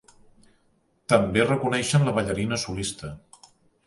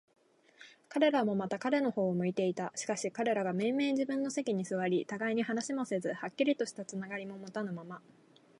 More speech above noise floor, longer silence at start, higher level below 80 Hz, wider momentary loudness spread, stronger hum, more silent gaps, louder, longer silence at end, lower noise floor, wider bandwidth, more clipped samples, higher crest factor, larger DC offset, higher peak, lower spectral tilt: first, 43 dB vs 27 dB; first, 1.1 s vs 0.6 s; first, -50 dBFS vs -82 dBFS; first, 18 LU vs 10 LU; neither; neither; first, -24 LUFS vs -34 LUFS; about the same, 0.7 s vs 0.6 s; first, -66 dBFS vs -60 dBFS; about the same, 11.5 kHz vs 11.5 kHz; neither; about the same, 22 dB vs 20 dB; neither; first, -4 dBFS vs -14 dBFS; about the same, -5 dB/octave vs -5 dB/octave